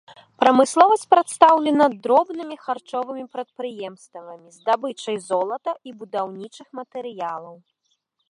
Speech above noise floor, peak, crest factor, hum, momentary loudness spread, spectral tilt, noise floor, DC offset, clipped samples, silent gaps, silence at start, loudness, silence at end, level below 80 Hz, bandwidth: 50 dB; 0 dBFS; 22 dB; none; 20 LU; -4 dB/octave; -72 dBFS; under 0.1%; under 0.1%; none; 0.4 s; -20 LUFS; 0.75 s; -76 dBFS; 11.5 kHz